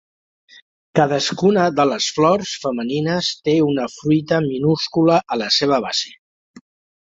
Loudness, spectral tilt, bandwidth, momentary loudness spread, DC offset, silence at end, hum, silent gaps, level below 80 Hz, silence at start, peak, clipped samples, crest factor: -18 LUFS; -5 dB/octave; 7.8 kHz; 6 LU; under 0.1%; 0.45 s; none; 6.19-6.54 s; -58 dBFS; 0.95 s; -2 dBFS; under 0.1%; 16 dB